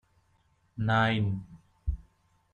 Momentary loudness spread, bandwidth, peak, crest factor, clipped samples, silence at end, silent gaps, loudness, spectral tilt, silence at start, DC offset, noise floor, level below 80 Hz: 16 LU; 7.2 kHz; -14 dBFS; 18 dB; under 0.1%; 0.55 s; none; -30 LUFS; -7.5 dB/octave; 0.75 s; under 0.1%; -69 dBFS; -44 dBFS